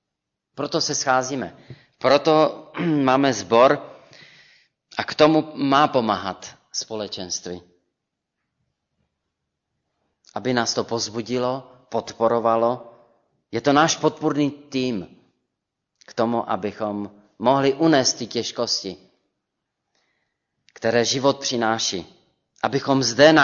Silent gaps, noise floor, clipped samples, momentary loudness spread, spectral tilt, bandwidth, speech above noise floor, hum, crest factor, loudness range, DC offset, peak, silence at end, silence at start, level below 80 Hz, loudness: none; -82 dBFS; under 0.1%; 14 LU; -4 dB/octave; 7.4 kHz; 61 dB; none; 20 dB; 9 LU; under 0.1%; -2 dBFS; 0 s; 0.55 s; -64 dBFS; -21 LUFS